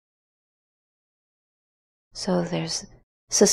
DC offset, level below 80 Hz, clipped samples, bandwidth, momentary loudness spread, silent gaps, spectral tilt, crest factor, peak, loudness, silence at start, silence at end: under 0.1%; -58 dBFS; under 0.1%; 15.5 kHz; 10 LU; 3.03-3.27 s; -3.5 dB/octave; 24 dB; -4 dBFS; -26 LUFS; 2.15 s; 0 s